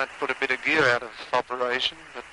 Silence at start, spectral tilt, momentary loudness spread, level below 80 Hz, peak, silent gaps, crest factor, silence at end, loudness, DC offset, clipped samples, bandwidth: 0 s; -3 dB/octave; 7 LU; -60 dBFS; -8 dBFS; none; 18 dB; 0 s; -24 LUFS; under 0.1%; under 0.1%; 11.5 kHz